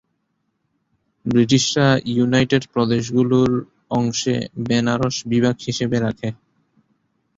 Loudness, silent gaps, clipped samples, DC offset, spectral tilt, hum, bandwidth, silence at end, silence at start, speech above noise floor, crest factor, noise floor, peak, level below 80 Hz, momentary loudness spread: -19 LUFS; none; under 0.1%; under 0.1%; -5.5 dB/octave; none; 7.8 kHz; 1.05 s; 1.25 s; 53 dB; 18 dB; -71 dBFS; -2 dBFS; -50 dBFS; 8 LU